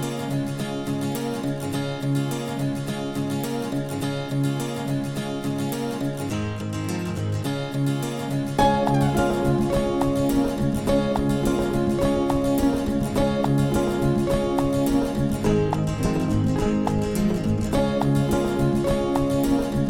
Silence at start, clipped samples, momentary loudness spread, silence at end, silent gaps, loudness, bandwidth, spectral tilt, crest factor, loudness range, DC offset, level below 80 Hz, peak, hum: 0 s; under 0.1%; 6 LU; 0 s; none; -24 LUFS; 17 kHz; -6.5 dB/octave; 16 dB; 5 LU; under 0.1%; -38 dBFS; -6 dBFS; none